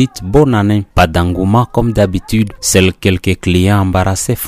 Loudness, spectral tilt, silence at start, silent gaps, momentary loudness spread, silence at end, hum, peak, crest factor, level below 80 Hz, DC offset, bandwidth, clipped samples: -12 LUFS; -5.5 dB/octave; 0 s; none; 4 LU; 0 s; none; 0 dBFS; 12 dB; -28 dBFS; under 0.1%; 16 kHz; under 0.1%